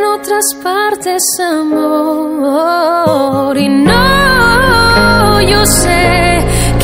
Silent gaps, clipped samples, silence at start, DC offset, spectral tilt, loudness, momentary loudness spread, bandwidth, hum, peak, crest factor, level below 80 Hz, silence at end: none; 0.2%; 0 s; under 0.1%; -4 dB/octave; -9 LUFS; 6 LU; 16.5 kHz; none; 0 dBFS; 10 dB; -22 dBFS; 0 s